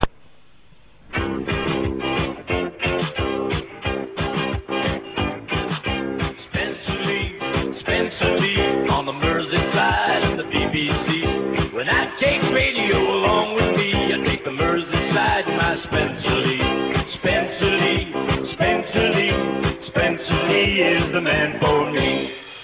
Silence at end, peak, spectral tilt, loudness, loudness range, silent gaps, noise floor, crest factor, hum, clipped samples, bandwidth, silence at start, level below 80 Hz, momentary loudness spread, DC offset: 0 s; 0 dBFS; -9.5 dB/octave; -21 LUFS; 5 LU; none; -54 dBFS; 20 dB; none; under 0.1%; 4 kHz; 0 s; -36 dBFS; 7 LU; under 0.1%